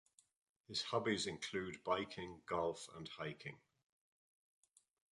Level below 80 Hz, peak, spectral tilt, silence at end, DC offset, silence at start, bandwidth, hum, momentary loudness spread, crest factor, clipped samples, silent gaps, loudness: -74 dBFS; -24 dBFS; -4 dB/octave; 1.55 s; under 0.1%; 0.7 s; 11.5 kHz; none; 11 LU; 22 dB; under 0.1%; none; -43 LUFS